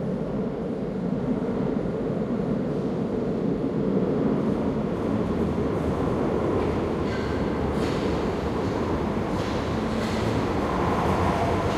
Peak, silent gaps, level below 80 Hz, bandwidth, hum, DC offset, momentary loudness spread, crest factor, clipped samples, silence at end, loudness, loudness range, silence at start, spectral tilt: -10 dBFS; none; -40 dBFS; 13.5 kHz; none; under 0.1%; 4 LU; 16 dB; under 0.1%; 0 s; -26 LUFS; 1 LU; 0 s; -7.5 dB/octave